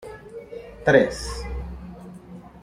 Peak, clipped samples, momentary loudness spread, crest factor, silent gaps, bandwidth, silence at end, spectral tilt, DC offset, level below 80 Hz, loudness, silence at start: -2 dBFS; under 0.1%; 24 LU; 22 dB; none; 13.5 kHz; 0 s; -5.5 dB/octave; under 0.1%; -38 dBFS; -22 LUFS; 0 s